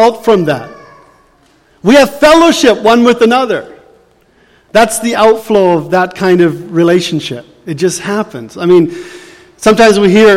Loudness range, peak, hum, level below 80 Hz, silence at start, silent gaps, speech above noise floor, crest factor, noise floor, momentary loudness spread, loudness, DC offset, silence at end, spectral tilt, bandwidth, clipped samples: 3 LU; 0 dBFS; none; -42 dBFS; 0 s; none; 40 dB; 10 dB; -48 dBFS; 12 LU; -9 LUFS; under 0.1%; 0 s; -5 dB/octave; 16.5 kHz; 0.2%